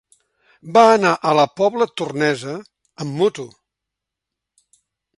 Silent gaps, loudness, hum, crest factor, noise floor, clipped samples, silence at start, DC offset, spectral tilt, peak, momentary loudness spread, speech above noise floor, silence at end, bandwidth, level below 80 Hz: none; -17 LUFS; none; 20 dB; -83 dBFS; under 0.1%; 0.65 s; under 0.1%; -5 dB/octave; 0 dBFS; 19 LU; 66 dB; 1.7 s; 11.5 kHz; -66 dBFS